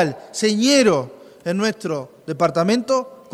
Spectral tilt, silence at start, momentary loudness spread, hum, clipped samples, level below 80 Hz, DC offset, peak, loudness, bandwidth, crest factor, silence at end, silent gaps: -4.5 dB/octave; 0 s; 14 LU; none; under 0.1%; -62 dBFS; under 0.1%; -4 dBFS; -19 LUFS; 13.5 kHz; 16 dB; 0.2 s; none